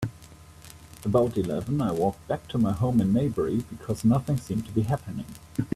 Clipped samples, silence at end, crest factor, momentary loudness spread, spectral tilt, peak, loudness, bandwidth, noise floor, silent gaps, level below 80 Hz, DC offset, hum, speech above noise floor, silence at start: under 0.1%; 0 s; 16 dB; 13 LU; -8 dB/octave; -10 dBFS; -27 LUFS; 14.5 kHz; -48 dBFS; none; -50 dBFS; under 0.1%; none; 23 dB; 0 s